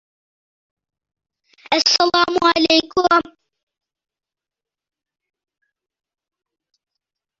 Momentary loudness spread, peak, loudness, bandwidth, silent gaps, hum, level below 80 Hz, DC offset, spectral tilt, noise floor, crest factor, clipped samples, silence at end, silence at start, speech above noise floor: 5 LU; 0 dBFS; -15 LUFS; 7.8 kHz; none; none; -58 dBFS; under 0.1%; -2 dB/octave; -88 dBFS; 22 dB; under 0.1%; 4.2 s; 1.7 s; 73 dB